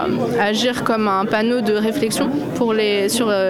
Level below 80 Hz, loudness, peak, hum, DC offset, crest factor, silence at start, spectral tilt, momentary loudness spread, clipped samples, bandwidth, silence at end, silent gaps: -54 dBFS; -18 LUFS; -6 dBFS; none; under 0.1%; 12 dB; 0 s; -4.5 dB/octave; 2 LU; under 0.1%; 17 kHz; 0 s; none